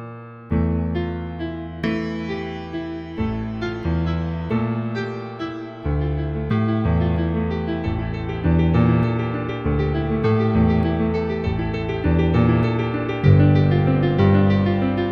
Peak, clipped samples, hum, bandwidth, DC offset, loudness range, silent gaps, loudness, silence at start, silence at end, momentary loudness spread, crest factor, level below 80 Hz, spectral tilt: -2 dBFS; under 0.1%; none; 6.4 kHz; under 0.1%; 8 LU; none; -21 LUFS; 0 s; 0 s; 12 LU; 18 dB; -32 dBFS; -9.5 dB/octave